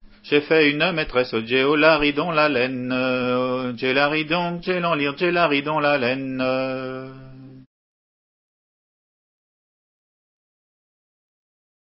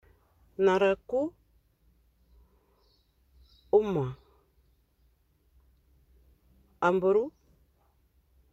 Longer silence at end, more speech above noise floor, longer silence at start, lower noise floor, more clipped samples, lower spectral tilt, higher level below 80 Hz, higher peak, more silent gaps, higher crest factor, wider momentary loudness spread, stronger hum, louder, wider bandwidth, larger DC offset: first, 4.3 s vs 1.25 s; first, over 69 dB vs 42 dB; second, 0.25 s vs 0.6 s; first, under -90 dBFS vs -68 dBFS; neither; first, -9.5 dB/octave vs -7 dB/octave; first, -54 dBFS vs -62 dBFS; first, 0 dBFS vs -12 dBFS; neither; about the same, 22 dB vs 20 dB; second, 8 LU vs 14 LU; neither; first, -20 LUFS vs -28 LUFS; second, 5.8 kHz vs 7.8 kHz; neither